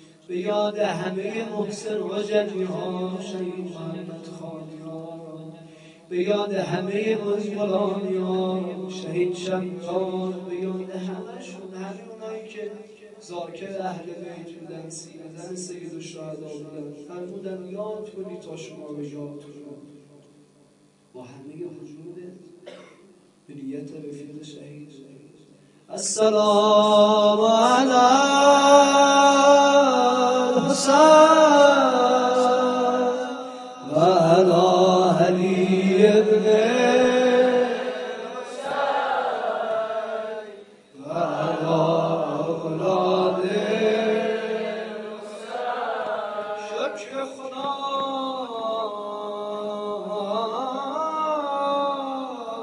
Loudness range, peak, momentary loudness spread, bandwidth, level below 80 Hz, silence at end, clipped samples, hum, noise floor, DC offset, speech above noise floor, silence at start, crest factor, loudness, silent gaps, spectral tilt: 21 LU; -2 dBFS; 21 LU; 11.5 kHz; -72 dBFS; 0 s; under 0.1%; none; -58 dBFS; under 0.1%; 35 dB; 0.3 s; 20 dB; -21 LUFS; none; -4.5 dB/octave